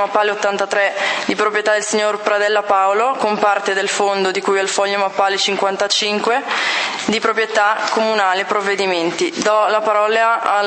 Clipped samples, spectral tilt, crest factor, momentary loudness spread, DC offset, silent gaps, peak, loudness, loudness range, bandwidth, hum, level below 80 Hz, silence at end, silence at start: under 0.1%; -2 dB/octave; 16 dB; 3 LU; under 0.1%; none; 0 dBFS; -16 LUFS; 1 LU; 8.8 kHz; none; -70 dBFS; 0 s; 0 s